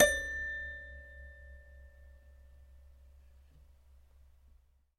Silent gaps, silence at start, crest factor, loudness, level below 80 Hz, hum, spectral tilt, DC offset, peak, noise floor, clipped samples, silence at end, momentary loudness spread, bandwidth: none; 0 s; 30 dB; -35 LUFS; -54 dBFS; none; -2 dB/octave; under 0.1%; -10 dBFS; -65 dBFS; under 0.1%; 2.2 s; 25 LU; 15.5 kHz